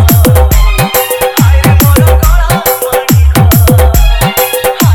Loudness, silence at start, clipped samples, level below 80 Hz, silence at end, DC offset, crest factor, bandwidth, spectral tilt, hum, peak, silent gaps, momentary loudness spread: -7 LUFS; 0 s; 2%; -10 dBFS; 0 s; under 0.1%; 6 dB; 18 kHz; -5 dB/octave; none; 0 dBFS; none; 4 LU